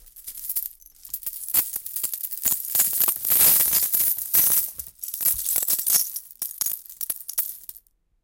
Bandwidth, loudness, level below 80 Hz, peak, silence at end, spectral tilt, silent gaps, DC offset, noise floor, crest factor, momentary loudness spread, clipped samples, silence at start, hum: 18 kHz; -20 LUFS; -58 dBFS; -4 dBFS; 0.5 s; 1 dB/octave; none; under 0.1%; -54 dBFS; 22 dB; 15 LU; under 0.1%; 0.05 s; none